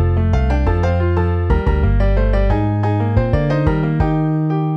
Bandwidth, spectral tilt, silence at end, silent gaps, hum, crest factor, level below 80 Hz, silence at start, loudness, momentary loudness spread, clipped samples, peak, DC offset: 6.2 kHz; -9.5 dB/octave; 0 s; none; none; 12 dB; -20 dBFS; 0 s; -17 LUFS; 1 LU; under 0.1%; -2 dBFS; under 0.1%